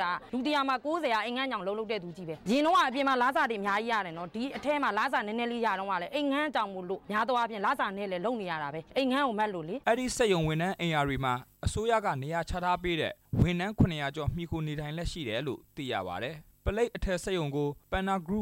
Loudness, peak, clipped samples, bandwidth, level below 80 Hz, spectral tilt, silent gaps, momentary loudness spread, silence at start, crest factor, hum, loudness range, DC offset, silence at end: -31 LUFS; -12 dBFS; under 0.1%; 16 kHz; -48 dBFS; -5.5 dB/octave; none; 8 LU; 0 s; 18 dB; none; 4 LU; under 0.1%; 0 s